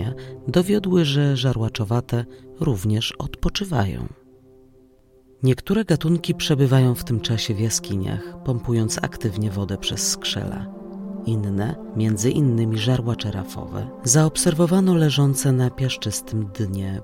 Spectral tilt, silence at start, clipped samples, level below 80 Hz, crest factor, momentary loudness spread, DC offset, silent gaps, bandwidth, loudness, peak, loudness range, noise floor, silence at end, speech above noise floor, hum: -5 dB/octave; 0 s; under 0.1%; -42 dBFS; 18 dB; 11 LU; under 0.1%; none; 17 kHz; -22 LUFS; -2 dBFS; 5 LU; -53 dBFS; 0 s; 32 dB; none